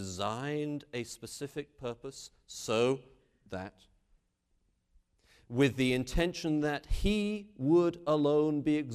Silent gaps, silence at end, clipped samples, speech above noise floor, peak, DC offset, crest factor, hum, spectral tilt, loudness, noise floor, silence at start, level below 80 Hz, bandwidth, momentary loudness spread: none; 0 s; under 0.1%; 44 dB; -14 dBFS; under 0.1%; 18 dB; none; -5.5 dB/octave; -32 LUFS; -76 dBFS; 0 s; -46 dBFS; 14.5 kHz; 15 LU